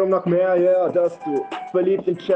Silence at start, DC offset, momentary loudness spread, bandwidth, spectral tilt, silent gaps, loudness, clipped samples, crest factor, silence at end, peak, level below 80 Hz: 0 s; under 0.1%; 8 LU; 7.8 kHz; -8.5 dB/octave; none; -20 LUFS; under 0.1%; 12 dB; 0 s; -8 dBFS; -68 dBFS